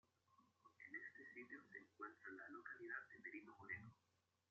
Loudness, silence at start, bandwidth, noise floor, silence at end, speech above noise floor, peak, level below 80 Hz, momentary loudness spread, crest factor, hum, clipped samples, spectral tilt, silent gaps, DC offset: -56 LUFS; 0.3 s; 7.2 kHz; -86 dBFS; 0.55 s; 30 dB; -38 dBFS; under -90 dBFS; 6 LU; 20 dB; none; under 0.1%; -4.5 dB/octave; none; under 0.1%